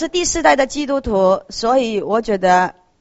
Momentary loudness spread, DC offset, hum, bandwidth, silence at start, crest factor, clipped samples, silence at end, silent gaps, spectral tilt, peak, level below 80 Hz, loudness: 5 LU; under 0.1%; none; 8.2 kHz; 0 s; 16 dB; under 0.1%; 0.3 s; none; -3.5 dB/octave; 0 dBFS; -40 dBFS; -16 LUFS